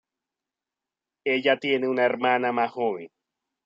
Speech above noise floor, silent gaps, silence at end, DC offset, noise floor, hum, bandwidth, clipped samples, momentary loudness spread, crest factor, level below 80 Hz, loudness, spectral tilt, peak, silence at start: 65 dB; none; 0.6 s; under 0.1%; -89 dBFS; none; 7.6 kHz; under 0.1%; 7 LU; 18 dB; -80 dBFS; -24 LUFS; -6 dB/octave; -8 dBFS; 1.25 s